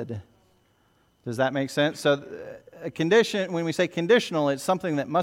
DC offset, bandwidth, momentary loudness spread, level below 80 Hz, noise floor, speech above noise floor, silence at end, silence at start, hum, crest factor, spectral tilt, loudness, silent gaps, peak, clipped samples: under 0.1%; 16 kHz; 18 LU; -68 dBFS; -65 dBFS; 40 dB; 0 s; 0 s; none; 18 dB; -5 dB/octave; -24 LUFS; none; -8 dBFS; under 0.1%